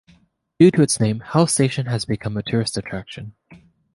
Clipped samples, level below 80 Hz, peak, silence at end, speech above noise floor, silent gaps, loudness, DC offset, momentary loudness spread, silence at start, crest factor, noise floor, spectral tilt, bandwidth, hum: under 0.1%; -50 dBFS; -2 dBFS; 0.4 s; 38 dB; none; -19 LUFS; under 0.1%; 17 LU; 0.6 s; 18 dB; -57 dBFS; -5.5 dB/octave; 11.5 kHz; none